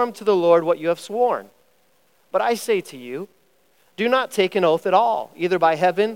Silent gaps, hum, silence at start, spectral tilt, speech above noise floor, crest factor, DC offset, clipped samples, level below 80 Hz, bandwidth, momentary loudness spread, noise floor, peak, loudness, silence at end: none; none; 0 s; -5 dB/octave; 42 dB; 18 dB; 0.1%; under 0.1%; -80 dBFS; 16.5 kHz; 13 LU; -62 dBFS; -4 dBFS; -20 LUFS; 0 s